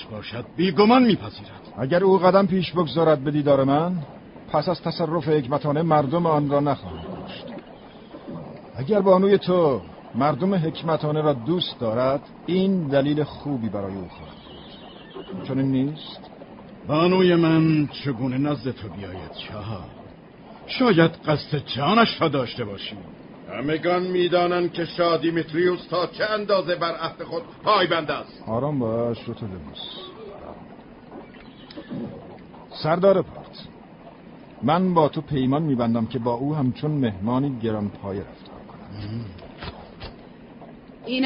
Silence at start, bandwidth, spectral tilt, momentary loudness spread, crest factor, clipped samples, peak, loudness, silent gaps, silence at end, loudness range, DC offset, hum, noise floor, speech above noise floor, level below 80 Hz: 0 s; 5.4 kHz; -11 dB/octave; 22 LU; 18 dB; under 0.1%; -4 dBFS; -22 LUFS; none; 0 s; 9 LU; under 0.1%; none; -44 dBFS; 22 dB; -52 dBFS